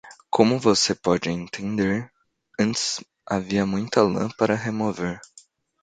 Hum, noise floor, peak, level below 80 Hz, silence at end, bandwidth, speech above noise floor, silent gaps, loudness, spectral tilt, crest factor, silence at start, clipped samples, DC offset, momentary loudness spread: none; -54 dBFS; 0 dBFS; -54 dBFS; 0.65 s; 9.4 kHz; 32 dB; none; -23 LUFS; -4.5 dB/octave; 22 dB; 0.05 s; under 0.1%; under 0.1%; 11 LU